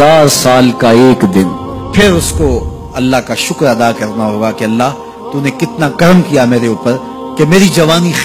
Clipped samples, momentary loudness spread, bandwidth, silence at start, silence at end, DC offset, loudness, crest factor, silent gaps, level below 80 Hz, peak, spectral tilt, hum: 2%; 9 LU; 15.5 kHz; 0 s; 0 s; under 0.1%; -10 LUFS; 10 dB; none; -28 dBFS; 0 dBFS; -5 dB/octave; none